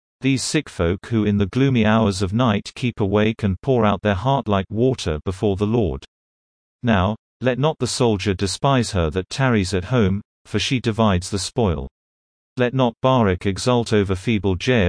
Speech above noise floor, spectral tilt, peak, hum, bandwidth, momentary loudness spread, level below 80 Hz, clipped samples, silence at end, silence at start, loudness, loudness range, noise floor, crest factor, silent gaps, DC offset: over 71 dB; -6 dB/octave; -4 dBFS; none; 10.5 kHz; 6 LU; -42 dBFS; under 0.1%; 0 s; 0.2 s; -20 LUFS; 3 LU; under -90 dBFS; 16 dB; 6.08-6.79 s, 7.19-7.40 s, 10.25-10.45 s, 11.91-12.56 s; under 0.1%